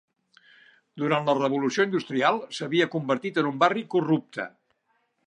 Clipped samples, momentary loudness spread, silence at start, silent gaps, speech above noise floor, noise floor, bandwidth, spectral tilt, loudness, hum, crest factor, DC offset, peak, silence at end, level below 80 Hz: under 0.1%; 8 LU; 0.95 s; none; 47 dB; -72 dBFS; 10.5 kHz; -5.5 dB/octave; -25 LUFS; none; 22 dB; under 0.1%; -4 dBFS; 0.8 s; -80 dBFS